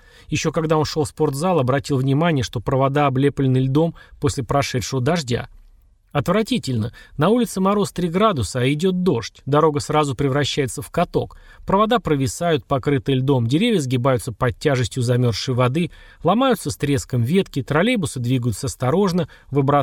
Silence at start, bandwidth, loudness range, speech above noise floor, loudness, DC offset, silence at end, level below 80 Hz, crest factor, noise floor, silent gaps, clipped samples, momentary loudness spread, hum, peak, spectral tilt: 0.3 s; 16.5 kHz; 2 LU; 32 dB; -20 LUFS; under 0.1%; 0 s; -44 dBFS; 16 dB; -51 dBFS; none; under 0.1%; 6 LU; none; -4 dBFS; -6 dB/octave